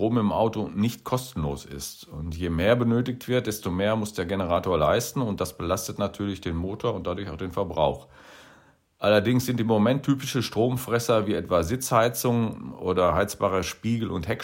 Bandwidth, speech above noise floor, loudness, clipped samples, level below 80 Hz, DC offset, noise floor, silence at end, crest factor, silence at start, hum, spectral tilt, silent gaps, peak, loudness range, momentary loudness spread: 16.5 kHz; 32 dB; -26 LUFS; under 0.1%; -46 dBFS; under 0.1%; -58 dBFS; 0 s; 20 dB; 0 s; none; -5.5 dB/octave; none; -6 dBFS; 4 LU; 9 LU